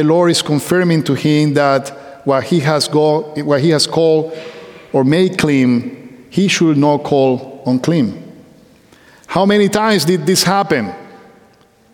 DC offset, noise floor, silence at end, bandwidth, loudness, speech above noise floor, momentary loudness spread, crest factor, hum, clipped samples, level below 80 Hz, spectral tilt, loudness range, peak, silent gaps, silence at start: under 0.1%; -49 dBFS; 0.8 s; 18 kHz; -14 LUFS; 36 dB; 9 LU; 14 dB; none; under 0.1%; -54 dBFS; -5 dB/octave; 2 LU; 0 dBFS; none; 0 s